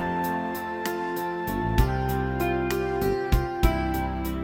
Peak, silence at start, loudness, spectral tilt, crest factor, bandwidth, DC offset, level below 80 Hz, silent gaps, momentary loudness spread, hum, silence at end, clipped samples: -4 dBFS; 0 s; -27 LUFS; -6.5 dB/octave; 20 dB; 17 kHz; under 0.1%; -32 dBFS; none; 5 LU; none; 0 s; under 0.1%